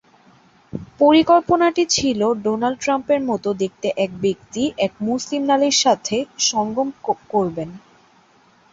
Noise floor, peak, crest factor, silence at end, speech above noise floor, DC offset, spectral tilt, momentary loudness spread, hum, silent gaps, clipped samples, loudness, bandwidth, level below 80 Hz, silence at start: -54 dBFS; -2 dBFS; 18 dB; 0.95 s; 36 dB; under 0.1%; -3.5 dB/octave; 9 LU; none; none; under 0.1%; -19 LUFS; 8 kHz; -54 dBFS; 0.75 s